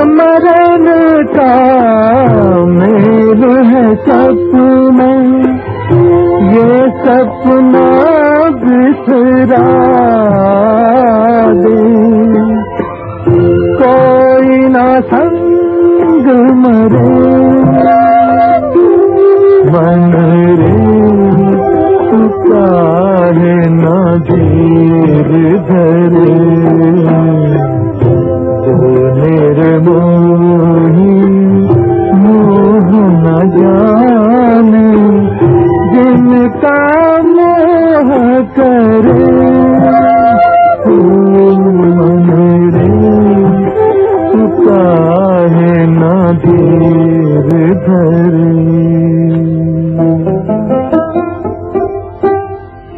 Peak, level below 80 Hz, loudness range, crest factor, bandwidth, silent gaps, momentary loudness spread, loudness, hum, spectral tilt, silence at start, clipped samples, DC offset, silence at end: 0 dBFS; -38 dBFS; 2 LU; 6 dB; 4.7 kHz; none; 4 LU; -7 LUFS; none; -12 dB/octave; 0 s; 0.4%; under 0.1%; 0 s